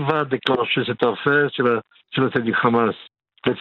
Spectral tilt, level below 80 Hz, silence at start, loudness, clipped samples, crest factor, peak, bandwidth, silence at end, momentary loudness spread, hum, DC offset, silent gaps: -8 dB/octave; -64 dBFS; 0 s; -20 LUFS; under 0.1%; 20 dB; 0 dBFS; 5.8 kHz; 0 s; 8 LU; none; under 0.1%; none